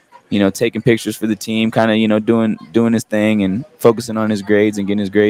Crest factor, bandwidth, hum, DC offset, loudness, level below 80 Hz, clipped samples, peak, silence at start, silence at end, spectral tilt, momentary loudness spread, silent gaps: 16 dB; 16 kHz; none; under 0.1%; -16 LUFS; -58 dBFS; under 0.1%; 0 dBFS; 0.3 s; 0 s; -6 dB/octave; 5 LU; none